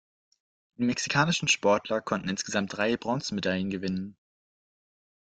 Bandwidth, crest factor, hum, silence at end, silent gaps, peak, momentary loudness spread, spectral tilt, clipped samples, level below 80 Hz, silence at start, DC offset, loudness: 9.4 kHz; 22 dB; none; 1.15 s; none; -8 dBFS; 8 LU; -4 dB/octave; under 0.1%; -64 dBFS; 0.8 s; under 0.1%; -28 LUFS